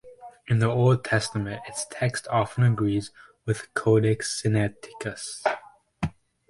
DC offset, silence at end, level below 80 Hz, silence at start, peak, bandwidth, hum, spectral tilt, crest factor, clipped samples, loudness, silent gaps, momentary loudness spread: under 0.1%; 0.4 s; -52 dBFS; 0.05 s; -8 dBFS; 11.5 kHz; none; -6 dB/octave; 18 dB; under 0.1%; -26 LUFS; none; 12 LU